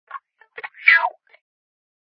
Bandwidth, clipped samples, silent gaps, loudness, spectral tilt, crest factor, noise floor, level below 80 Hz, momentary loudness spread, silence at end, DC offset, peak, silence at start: 5.4 kHz; under 0.1%; none; -16 LUFS; -2 dB/octave; 24 dB; -40 dBFS; -90 dBFS; 25 LU; 1 s; under 0.1%; 0 dBFS; 0.15 s